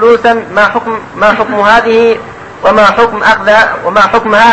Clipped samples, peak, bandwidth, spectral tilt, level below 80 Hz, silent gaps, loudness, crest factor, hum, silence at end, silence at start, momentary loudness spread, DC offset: 2%; 0 dBFS; 10.5 kHz; -4.5 dB/octave; -38 dBFS; none; -8 LUFS; 8 dB; none; 0 s; 0 s; 7 LU; under 0.1%